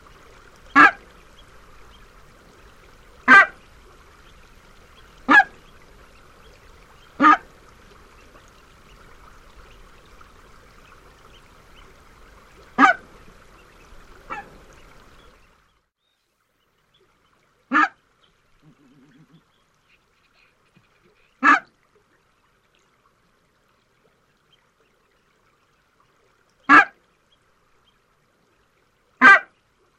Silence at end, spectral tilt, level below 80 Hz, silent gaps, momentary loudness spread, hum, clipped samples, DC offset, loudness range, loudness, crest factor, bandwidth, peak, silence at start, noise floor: 0.55 s; -3.5 dB/octave; -56 dBFS; none; 23 LU; none; under 0.1%; under 0.1%; 10 LU; -15 LUFS; 24 dB; 12 kHz; 0 dBFS; 0.75 s; -71 dBFS